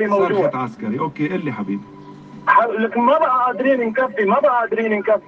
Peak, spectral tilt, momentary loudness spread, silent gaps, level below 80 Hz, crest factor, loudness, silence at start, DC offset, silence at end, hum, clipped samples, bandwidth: -2 dBFS; -8 dB/octave; 9 LU; none; -64 dBFS; 16 dB; -18 LUFS; 0 s; under 0.1%; 0.1 s; none; under 0.1%; 7.2 kHz